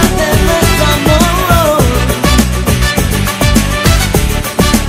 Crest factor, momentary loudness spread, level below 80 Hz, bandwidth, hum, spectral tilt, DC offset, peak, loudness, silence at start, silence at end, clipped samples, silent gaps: 10 dB; 3 LU; -16 dBFS; 16.5 kHz; none; -4.5 dB/octave; under 0.1%; 0 dBFS; -10 LUFS; 0 s; 0 s; 0.7%; none